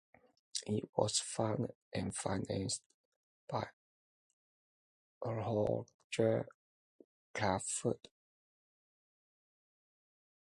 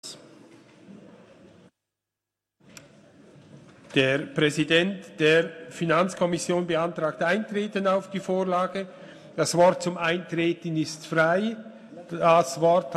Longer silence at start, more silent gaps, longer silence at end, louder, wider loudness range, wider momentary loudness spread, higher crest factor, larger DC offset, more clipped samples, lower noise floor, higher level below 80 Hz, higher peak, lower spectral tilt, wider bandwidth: first, 0.55 s vs 0.05 s; first, 0.89-0.93 s, 1.75-1.91 s, 2.86-3.47 s, 3.73-5.21 s, 5.94-6.10 s, 6.54-7.34 s vs none; first, 2.5 s vs 0 s; second, -38 LUFS vs -24 LUFS; about the same, 5 LU vs 3 LU; second, 9 LU vs 14 LU; about the same, 24 dB vs 20 dB; neither; neither; about the same, under -90 dBFS vs -87 dBFS; about the same, -66 dBFS vs -68 dBFS; second, -16 dBFS vs -6 dBFS; about the same, -4.5 dB/octave vs -5 dB/octave; second, 11.5 kHz vs 13.5 kHz